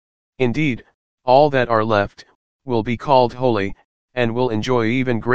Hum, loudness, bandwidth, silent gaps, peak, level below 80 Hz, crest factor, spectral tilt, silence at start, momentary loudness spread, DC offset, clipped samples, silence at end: none; -19 LUFS; 8 kHz; 0.94-1.18 s, 2.35-2.59 s, 3.85-4.08 s; 0 dBFS; -46 dBFS; 18 dB; -7 dB/octave; 0.3 s; 13 LU; 2%; under 0.1%; 0 s